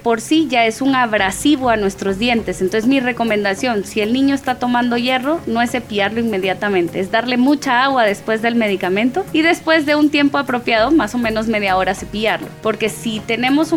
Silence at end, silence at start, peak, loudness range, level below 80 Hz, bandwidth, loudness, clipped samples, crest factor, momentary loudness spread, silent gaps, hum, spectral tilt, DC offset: 0 s; 0 s; -2 dBFS; 2 LU; -44 dBFS; 16.5 kHz; -16 LUFS; under 0.1%; 14 dB; 5 LU; none; none; -4.5 dB/octave; under 0.1%